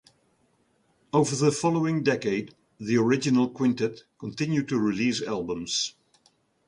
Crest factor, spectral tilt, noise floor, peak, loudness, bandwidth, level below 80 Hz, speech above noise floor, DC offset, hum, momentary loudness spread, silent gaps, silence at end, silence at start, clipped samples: 18 dB; -5 dB/octave; -68 dBFS; -8 dBFS; -26 LUFS; 11 kHz; -64 dBFS; 42 dB; under 0.1%; none; 9 LU; none; 0.8 s; 1.15 s; under 0.1%